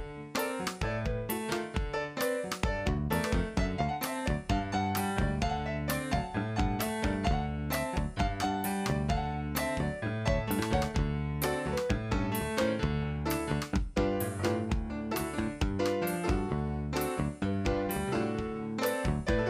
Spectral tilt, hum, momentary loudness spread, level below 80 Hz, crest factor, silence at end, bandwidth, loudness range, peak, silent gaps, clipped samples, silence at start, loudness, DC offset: -5.5 dB/octave; none; 3 LU; -40 dBFS; 18 dB; 0 s; 15.5 kHz; 1 LU; -12 dBFS; none; under 0.1%; 0 s; -32 LUFS; under 0.1%